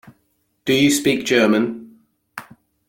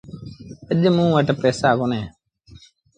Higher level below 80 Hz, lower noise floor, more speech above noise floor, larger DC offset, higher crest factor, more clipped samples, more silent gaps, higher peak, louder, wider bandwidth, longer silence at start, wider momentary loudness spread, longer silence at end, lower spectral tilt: second, -58 dBFS vs -52 dBFS; first, -67 dBFS vs -48 dBFS; first, 50 dB vs 30 dB; neither; about the same, 18 dB vs 18 dB; neither; neither; about the same, -2 dBFS vs -4 dBFS; about the same, -17 LUFS vs -19 LUFS; first, 17 kHz vs 9.4 kHz; about the same, 0.05 s vs 0.1 s; about the same, 22 LU vs 21 LU; second, 0.5 s vs 0.9 s; second, -4 dB/octave vs -7 dB/octave